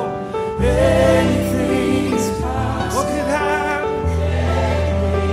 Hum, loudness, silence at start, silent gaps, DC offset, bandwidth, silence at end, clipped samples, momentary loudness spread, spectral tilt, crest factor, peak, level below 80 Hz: none; -18 LUFS; 0 s; none; under 0.1%; 16 kHz; 0 s; under 0.1%; 7 LU; -6 dB/octave; 16 dB; -2 dBFS; -28 dBFS